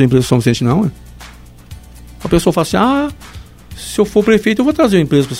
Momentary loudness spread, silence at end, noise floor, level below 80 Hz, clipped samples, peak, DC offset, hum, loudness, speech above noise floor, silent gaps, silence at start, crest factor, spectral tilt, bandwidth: 13 LU; 0 s; -35 dBFS; -34 dBFS; under 0.1%; 0 dBFS; under 0.1%; 60 Hz at -40 dBFS; -13 LUFS; 22 dB; none; 0 s; 14 dB; -6 dB/octave; 16 kHz